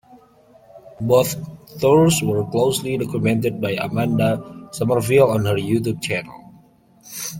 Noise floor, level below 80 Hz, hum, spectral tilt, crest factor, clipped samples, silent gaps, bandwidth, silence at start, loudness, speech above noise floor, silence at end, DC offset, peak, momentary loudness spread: -52 dBFS; -52 dBFS; none; -5.5 dB/octave; 18 dB; under 0.1%; none; 17 kHz; 0.15 s; -19 LUFS; 33 dB; 0 s; under 0.1%; -2 dBFS; 14 LU